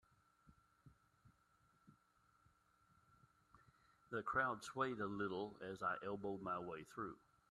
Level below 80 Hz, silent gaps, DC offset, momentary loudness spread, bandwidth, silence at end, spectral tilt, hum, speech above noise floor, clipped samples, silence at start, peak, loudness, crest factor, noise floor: -78 dBFS; none; under 0.1%; 10 LU; 12.5 kHz; 0.35 s; -5.5 dB/octave; none; 32 dB; under 0.1%; 0.45 s; -26 dBFS; -45 LUFS; 22 dB; -77 dBFS